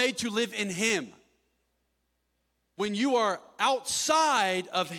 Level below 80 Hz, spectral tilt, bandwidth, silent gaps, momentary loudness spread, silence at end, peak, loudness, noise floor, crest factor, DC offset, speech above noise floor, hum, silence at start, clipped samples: -72 dBFS; -2.5 dB/octave; 19 kHz; none; 8 LU; 0 s; -10 dBFS; -27 LUFS; -77 dBFS; 18 dB; under 0.1%; 49 dB; none; 0 s; under 0.1%